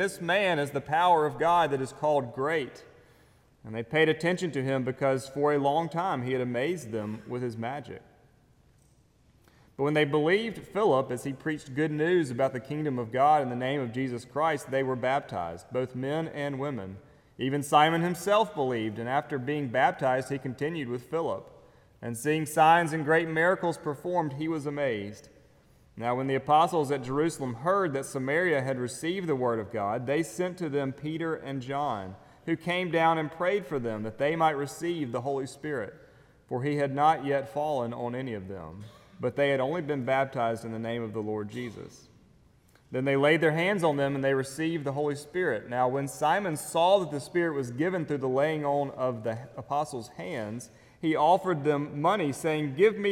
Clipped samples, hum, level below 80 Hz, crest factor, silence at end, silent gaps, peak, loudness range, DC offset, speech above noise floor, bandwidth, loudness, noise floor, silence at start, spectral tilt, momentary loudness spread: under 0.1%; none; -66 dBFS; 22 dB; 0 s; none; -8 dBFS; 4 LU; under 0.1%; 34 dB; 17 kHz; -28 LUFS; -62 dBFS; 0 s; -5.5 dB/octave; 11 LU